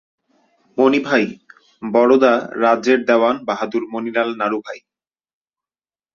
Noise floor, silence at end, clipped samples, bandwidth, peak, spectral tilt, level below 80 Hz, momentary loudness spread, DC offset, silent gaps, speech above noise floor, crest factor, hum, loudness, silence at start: under -90 dBFS; 1.35 s; under 0.1%; 7.2 kHz; -2 dBFS; -5.5 dB/octave; -66 dBFS; 13 LU; under 0.1%; none; over 74 dB; 18 dB; none; -17 LUFS; 0.75 s